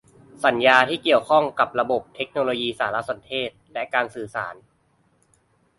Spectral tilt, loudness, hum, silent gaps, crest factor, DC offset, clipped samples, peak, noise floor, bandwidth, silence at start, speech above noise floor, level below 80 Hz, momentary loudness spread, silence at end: -4.5 dB/octave; -22 LUFS; none; none; 22 dB; under 0.1%; under 0.1%; 0 dBFS; -64 dBFS; 11.5 kHz; 0.4 s; 42 dB; -64 dBFS; 14 LU; 1.25 s